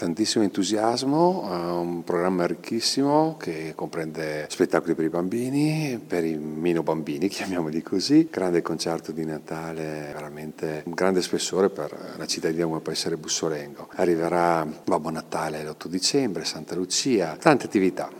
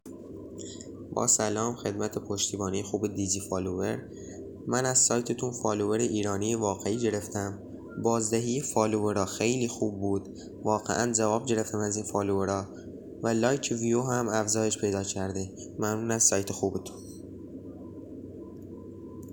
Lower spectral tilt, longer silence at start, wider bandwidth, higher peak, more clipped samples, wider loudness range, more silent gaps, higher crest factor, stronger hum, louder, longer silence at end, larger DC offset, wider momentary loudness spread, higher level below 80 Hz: about the same, -4.5 dB/octave vs -4 dB/octave; about the same, 0 s vs 0.05 s; second, 17.5 kHz vs 20 kHz; first, 0 dBFS vs -8 dBFS; neither; about the same, 3 LU vs 3 LU; neither; about the same, 24 dB vs 22 dB; neither; first, -25 LUFS vs -28 LUFS; about the same, 0 s vs 0 s; neither; second, 11 LU vs 19 LU; about the same, -64 dBFS vs -64 dBFS